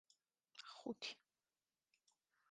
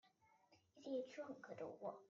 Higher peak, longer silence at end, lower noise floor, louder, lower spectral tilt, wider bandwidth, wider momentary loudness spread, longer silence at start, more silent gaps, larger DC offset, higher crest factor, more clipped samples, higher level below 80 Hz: about the same, -34 dBFS vs -36 dBFS; first, 1.35 s vs 0.05 s; first, under -90 dBFS vs -76 dBFS; about the same, -52 LUFS vs -52 LUFS; second, -2.5 dB/octave vs -4.5 dB/octave; first, 9.4 kHz vs 7.4 kHz; first, 12 LU vs 6 LU; first, 0.55 s vs 0.05 s; neither; neither; first, 24 dB vs 18 dB; neither; about the same, under -90 dBFS vs under -90 dBFS